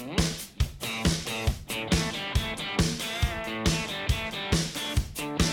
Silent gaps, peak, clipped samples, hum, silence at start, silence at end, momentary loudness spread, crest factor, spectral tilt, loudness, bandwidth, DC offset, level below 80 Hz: none; -14 dBFS; under 0.1%; none; 0 s; 0 s; 3 LU; 16 dB; -4 dB/octave; -29 LUFS; 18.5 kHz; under 0.1%; -34 dBFS